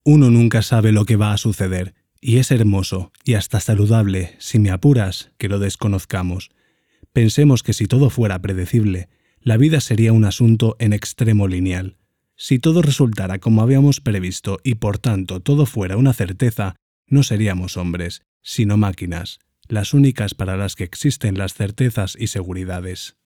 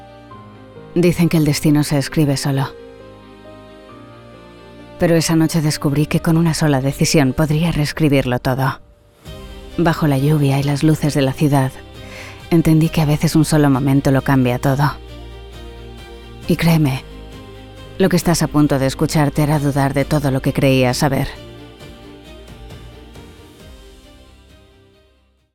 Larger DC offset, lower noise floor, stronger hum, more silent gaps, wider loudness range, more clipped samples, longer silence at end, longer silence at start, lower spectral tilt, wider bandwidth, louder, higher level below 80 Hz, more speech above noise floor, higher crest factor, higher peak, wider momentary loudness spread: neither; about the same, -54 dBFS vs -56 dBFS; neither; first, 16.82-17.03 s, 18.28-18.40 s vs none; about the same, 4 LU vs 5 LU; neither; second, 0.2 s vs 1.8 s; about the same, 0.05 s vs 0 s; about the same, -6.5 dB/octave vs -6 dB/octave; about the same, 16.5 kHz vs 18 kHz; about the same, -18 LUFS vs -16 LUFS; second, -44 dBFS vs -38 dBFS; about the same, 38 dB vs 41 dB; about the same, 14 dB vs 16 dB; about the same, -2 dBFS vs -2 dBFS; second, 12 LU vs 22 LU